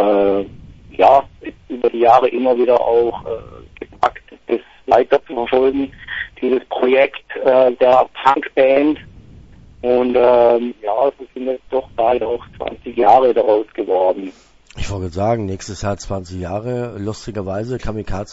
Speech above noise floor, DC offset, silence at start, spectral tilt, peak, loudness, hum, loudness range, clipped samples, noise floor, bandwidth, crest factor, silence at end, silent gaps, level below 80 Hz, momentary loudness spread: 26 dB; under 0.1%; 0 s; -6.5 dB/octave; 0 dBFS; -17 LUFS; none; 7 LU; under 0.1%; -41 dBFS; 8 kHz; 16 dB; 0 s; none; -40 dBFS; 15 LU